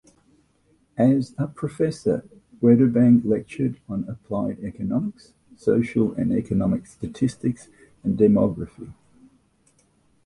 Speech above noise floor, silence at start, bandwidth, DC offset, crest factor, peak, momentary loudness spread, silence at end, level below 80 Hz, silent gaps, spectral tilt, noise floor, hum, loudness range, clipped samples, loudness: 41 dB; 1 s; 11 kHz; under 0.1%; 20 dB; -4 dBFS; 14 LU; 1.35 s; -52 dBFS; none; -9 dB/octave; -63 dBFS; none; 4 LU; under 0.1%; -22 LUFS